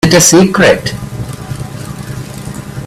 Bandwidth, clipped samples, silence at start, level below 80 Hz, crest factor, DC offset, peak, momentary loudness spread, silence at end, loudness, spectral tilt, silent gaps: over 20 kHz; 0.2%; 0.05 s; -36 dBFS; 12 dB; under 0.1%; 0 dBFS; 19 LU; 0 s; -8 LUFS; -4 dB/octave; none